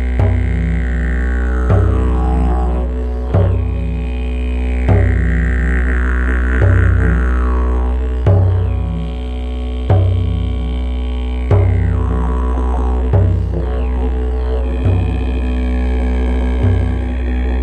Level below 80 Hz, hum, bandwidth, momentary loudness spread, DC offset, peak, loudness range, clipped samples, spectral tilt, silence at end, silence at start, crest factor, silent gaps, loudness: -16 dBFS; none; 4.1 kHz; 7 LU; under 0.1%; 0 dBFS; 2 LU; under 0.1%; -9 dB/octave; 0 s; 0 s; 12 dB; none; -16 LUFS